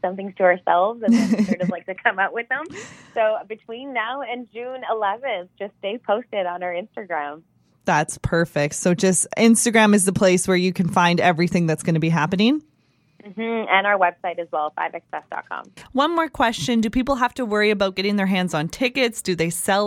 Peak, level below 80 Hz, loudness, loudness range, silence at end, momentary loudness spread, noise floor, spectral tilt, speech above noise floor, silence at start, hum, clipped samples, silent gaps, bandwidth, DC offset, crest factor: -2 dBFS; -50 dBFS; -21 LUFS; 9 LU; 0 s; 14 LU; -56 dBFS; -4.5 dB/octave; 35 dB; 0.05 s; none; under 0.1%; none; 15.5 kHz; under 0.1%; 20 dB